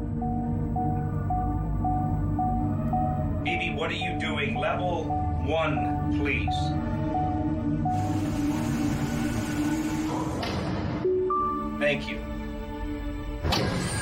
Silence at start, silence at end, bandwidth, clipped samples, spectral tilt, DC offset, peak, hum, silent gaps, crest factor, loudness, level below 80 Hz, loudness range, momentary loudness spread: 0 s; 0 s; 16.5 kHz; under 0.1%; -6 dB/octave; under 0.1%; -12 dBFS; none; none; 16 dB; -28 LUFS; -38 dBFS; 1 LU; 4 LU